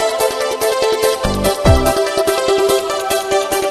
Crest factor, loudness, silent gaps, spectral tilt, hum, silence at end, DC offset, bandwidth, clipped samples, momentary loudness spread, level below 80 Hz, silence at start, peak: 14 dB; -15 LUFS; none; -4 dB/octave; none; 0 s; under 0.1%; 13.5 kHz; under 0.1%; 4 LU; -26 dBFS; 0 s; 0 dBFS